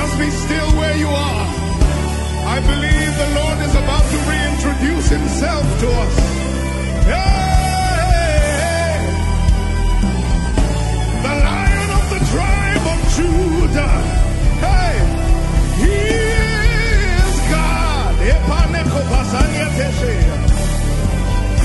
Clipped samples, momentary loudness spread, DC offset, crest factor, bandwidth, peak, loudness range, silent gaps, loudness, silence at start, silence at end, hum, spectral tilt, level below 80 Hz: under 0.1%; 3 LU; under 0.1%; 14 dB; 12 kHz; 0 dBFS; 1 LU; none; -16 LUFS; 0 s; 0 s; none; -5.5 dB/octave; -16 dBFS